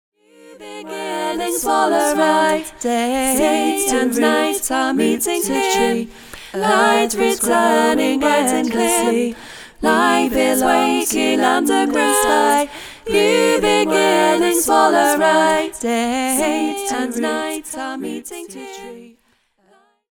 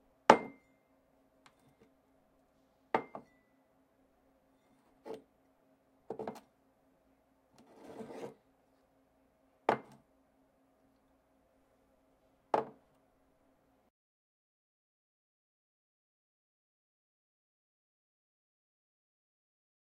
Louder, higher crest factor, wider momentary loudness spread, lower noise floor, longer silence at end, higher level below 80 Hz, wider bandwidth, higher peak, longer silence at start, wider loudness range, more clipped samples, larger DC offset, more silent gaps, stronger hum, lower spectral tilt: first, -16 LUFS vs -34 LUFS; second, 16 dB vs 40 dB; second, 13 LU vs 25 LU; second, -61 dBFS vs -72 dBFS; second, 1.05 s vs 7.2 s; first, -48 dBFS vs -80 dBFS; first, 19 kHz vs 15.5 kHz; about the same, -2 dBFS vs -4 dBFS; first, 0.45 s vs 0.3 s; second, 5 LU vs 8 LU; neither; neither; neither; neither; second, -2.5 dB/octave vs -4.5 dB/octave